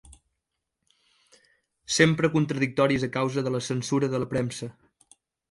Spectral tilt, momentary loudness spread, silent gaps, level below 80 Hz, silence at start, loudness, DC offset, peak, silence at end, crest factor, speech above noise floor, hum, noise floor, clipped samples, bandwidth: -5 dB/octave; 9 LU; none; -60 dBFS; 0.1 s; -25 LUFS; under 0.1%; -6 dBFS; 0.8 s; 22 dB; 58 dB; none; -82 dBFS; under 0.1%; 11.5 kHz